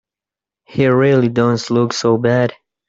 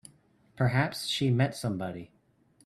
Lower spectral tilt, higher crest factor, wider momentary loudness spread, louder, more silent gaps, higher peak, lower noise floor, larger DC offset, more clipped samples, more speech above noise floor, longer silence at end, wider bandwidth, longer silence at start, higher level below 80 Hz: about the same, -6.5 dB/octave vs -5.5 dB/octave; about the same, 14 dB vs 18 dB; second, 5 LU vs 10 LU; first, -15 LUFS vs -29 LUFS; neither; first, -2 dBFS vs -14 dBFS; first, -88 dBFS vs -65 dBFS; neither; neither; first, 74 dB vs 37 dB; second, 0.35 s vs 0.6 s; second, 7.8 kHz vs 13 kHz; first, 0.7 s vs 0.55 s; first, -54 dBFS vs -64 dBFS